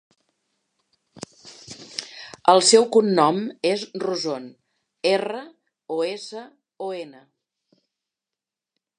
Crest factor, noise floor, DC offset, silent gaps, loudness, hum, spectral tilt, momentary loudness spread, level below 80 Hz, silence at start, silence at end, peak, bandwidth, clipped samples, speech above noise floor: 24 dB; -88 dBFS; under 0.1%; none; -21 LUFS; none; -3 dB/octave; 25 LU; -76 dBFS; 1.45 s; 1.9 s; -2 dBFS; 11 kHz; under 0.1%; 67 dB